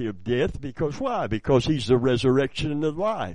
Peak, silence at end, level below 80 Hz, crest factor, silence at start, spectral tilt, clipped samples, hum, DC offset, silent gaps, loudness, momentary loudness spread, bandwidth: -6 dBFS; 0 s; -44 dBFS; 18 dB; 0 s; -6.5 dB/octave; under 0.1%; none; 0.8%; none; -24 LUFS; 7 LU; 10 kHz